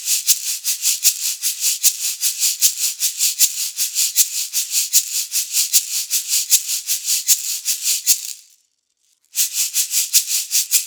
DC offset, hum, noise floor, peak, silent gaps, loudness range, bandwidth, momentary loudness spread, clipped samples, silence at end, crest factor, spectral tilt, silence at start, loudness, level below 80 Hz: under 0.1%; none; -65 dBFS; 0 dBFS; none; 2 LU; over 20 kHz; 5 LU; under 0.1%; 0 s; 20 dB; 8.5 dB/octave; 0 s; -16 LUFS; -84 dBFS